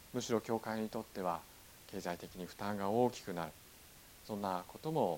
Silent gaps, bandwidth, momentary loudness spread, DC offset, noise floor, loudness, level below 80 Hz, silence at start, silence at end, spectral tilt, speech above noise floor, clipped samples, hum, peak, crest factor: none; 17.5 kHz; 21 LU; under 0.1%; -59 dBFS; -40 LUFS; -68 dBFS; 0 s; 0 s; -5.5 dB/octave; 20 dB; under 0.1%; none; -20 dBFS; 20 dB